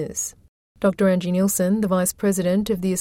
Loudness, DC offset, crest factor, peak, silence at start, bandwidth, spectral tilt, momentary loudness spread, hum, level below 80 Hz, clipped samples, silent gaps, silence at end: -21 LUFS; under 0.1%; 14 dB; -8 dBFS; 0 s; 16.5 kHz; -5.5 dB/octave; 6 LU; none; -52 dBFS; under 0.1%; 0.48-0.75 s; 0 s